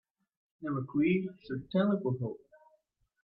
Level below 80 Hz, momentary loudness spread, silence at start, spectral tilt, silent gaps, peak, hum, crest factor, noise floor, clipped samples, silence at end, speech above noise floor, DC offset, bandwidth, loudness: -70 dBFS; 12 LU; 0.6 s; -11 dB/octave; none; -18 dBFS; none; 16 dB; -73 dBFS; under 0.1%; 0.85 s; 42 dB; under 0.1%; 5.4 kHz; -33 LUFS